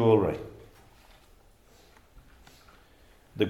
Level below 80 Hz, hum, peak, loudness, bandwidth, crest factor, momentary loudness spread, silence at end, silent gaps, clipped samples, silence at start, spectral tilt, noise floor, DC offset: -58 dBFS; none; -10 dBFS; -27 LUFS; 13.5 kHz; 22 dB; 31 LU; 0 s; none; under 0.1%; 0 s; -8 dB/octave; -58 dBFS; under 0.1%